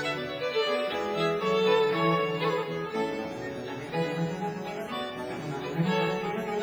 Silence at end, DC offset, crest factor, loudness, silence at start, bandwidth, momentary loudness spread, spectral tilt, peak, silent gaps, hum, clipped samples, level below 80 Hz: 0 s; under 0.1%; 16 dB; -29 LUFS; 0 s; over 20 kHz; 10 LU; -6 dB/octave; -12 dBFS; none; none; under 0.1%; -64 dBFS